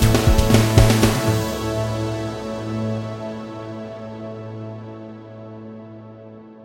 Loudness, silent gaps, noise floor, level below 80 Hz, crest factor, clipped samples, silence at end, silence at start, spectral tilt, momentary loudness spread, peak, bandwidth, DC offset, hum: -20 LUFS; none; -40 dBFS; -28 dBFS; 20 dB; under 0.1%; 0 s; 0 s; -5.5 dB/octave; 23 LU; 0 dBFS; 16 kHz; under 0.1%; none